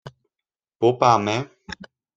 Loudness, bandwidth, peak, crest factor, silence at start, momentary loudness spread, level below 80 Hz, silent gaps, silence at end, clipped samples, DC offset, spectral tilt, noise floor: -20 LUFS; 7.8 kHz; -2 dBFS; 22 dB; 0.05 s; 21 LU; -60 dBFS; none; 0.4 s; under 0.1%; under 0.1%; -5.5 dB/octave; -89 dBFS